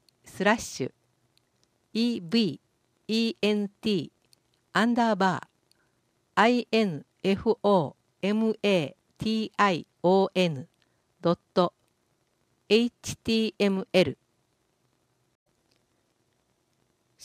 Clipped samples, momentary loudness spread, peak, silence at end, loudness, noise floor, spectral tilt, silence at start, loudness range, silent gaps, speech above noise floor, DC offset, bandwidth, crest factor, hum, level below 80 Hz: under 0.1%; 11 LU; -6 dBFS; 3.1 s; -27 LUFS; -72 dBFS; -5.5 dB/octave; 0.25 s; 4 LU; none; 47 dB; under 0.1%; 15 kHz; 22 dB; none; -64 dBFS